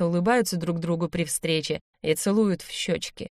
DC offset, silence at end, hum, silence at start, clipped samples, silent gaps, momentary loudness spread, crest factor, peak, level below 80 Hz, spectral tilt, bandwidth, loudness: under 0.1%; 0.1 s; none; 0 s; under 0.1%; 1.81-1.93 s; 7 LU; 16 dB; -10 dBFS; -56 dBFS; -4.5 dB/octave; 15.5 kHz; -26 LUFS